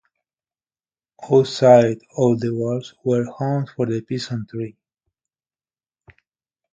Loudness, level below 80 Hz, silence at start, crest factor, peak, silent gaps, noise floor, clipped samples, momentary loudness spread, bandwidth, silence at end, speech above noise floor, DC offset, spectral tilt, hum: -19 LUFS; -62 dBFS; 1.2 s; 20 dB; 0 dBFS; none; under -90 dBFS; under 0.1%; 15 LU; 9 kHz; 2 s; over 71 dB; under 0.1%; -7 dB/octave; none